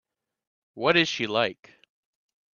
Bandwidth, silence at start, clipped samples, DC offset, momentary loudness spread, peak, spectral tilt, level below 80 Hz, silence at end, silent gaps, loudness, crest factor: 7.2 kHz; 0.75 s; under 0.1%; under 0.1%; 7 LU; -6 dBFS; -4 dB/octave; -70 dBFS; 1 s; none; -24 LUFS; 24 dB